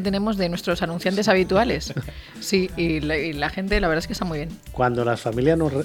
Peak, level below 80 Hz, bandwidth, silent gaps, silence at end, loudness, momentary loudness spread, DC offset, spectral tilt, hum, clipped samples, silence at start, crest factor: -4 dBFS; -38 dBFS; 18 kHz; none; 0 s; -23 LUFS; 10 LU; under 0.1%; -5.5 dB/octave; none; under 0.1%; 0 s; 18 dB